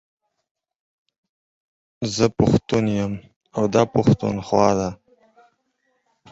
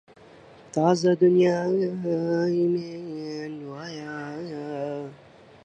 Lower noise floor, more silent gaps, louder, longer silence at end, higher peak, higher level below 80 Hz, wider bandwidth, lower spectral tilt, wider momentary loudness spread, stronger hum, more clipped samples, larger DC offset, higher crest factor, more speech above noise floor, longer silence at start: first, -70 dBFS vs -51 dBFS; first, 3.36-3.41 s vs none; first, -21 LUFS vs -25 LUFS; first, 1.35 s vs 0.5 s; first, -2 dBFS vs -8 dBFS; first, -48 dBFS vs -72 dBFS; about the same, 8 kHz vs 8.6 kHz; about the same, -6.5 dB/octave vs -7 dB/octave; second, 12 LU vs 17 LU; neither; neither; neither; about the same, 20 dB vs 18 dB; first, 51 dB vs 27 dB; first, 2 s vs 0.2 s